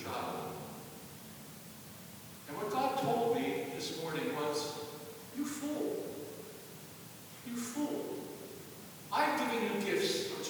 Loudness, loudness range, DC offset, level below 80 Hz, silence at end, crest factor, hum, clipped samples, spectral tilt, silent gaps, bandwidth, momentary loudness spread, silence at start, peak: -37 LUFS; 5 LU; under 0.1%; -76 dBFS; 0 s; 20 dB; none; under 0.1%; -4 dB/octave; none; over 20 kHz; 17 LU; 0 s; -18 dBFS